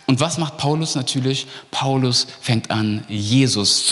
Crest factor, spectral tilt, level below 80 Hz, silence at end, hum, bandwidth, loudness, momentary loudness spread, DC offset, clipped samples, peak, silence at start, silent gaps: 16 dB; -4 dB/octave; -58 dBFS; 0 s; none; 12 kHz; -19 LUFS; 8 LU; under 0.1%; under 0.1%; -4 dBFS; 0.1 s; none